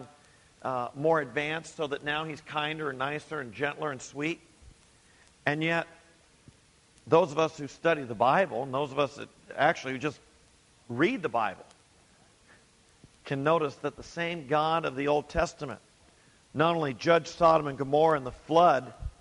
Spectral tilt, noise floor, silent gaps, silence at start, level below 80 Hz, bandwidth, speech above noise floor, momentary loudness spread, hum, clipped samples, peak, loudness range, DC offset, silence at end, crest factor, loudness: -5.5 dB/octave; -61 dBFS; none; 0 s; -56 dBFS; 11.5 kHz; 33 dB; 13 LU; none; under 0.1%; -8 dBFS; 7 LU; under 0.1%; 0.1 s; 22 dB; -29 LUFS